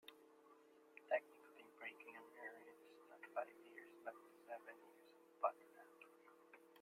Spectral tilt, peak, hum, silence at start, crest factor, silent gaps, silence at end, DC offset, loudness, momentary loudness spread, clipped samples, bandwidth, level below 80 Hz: -3 dB/octave; -28 dBFS; none; 0.05 s; 26 dB; none; 0 s; under 0.1%; -51 LUFS; 23 LU; under 0.1%; 16 kHz; under -90 dBFS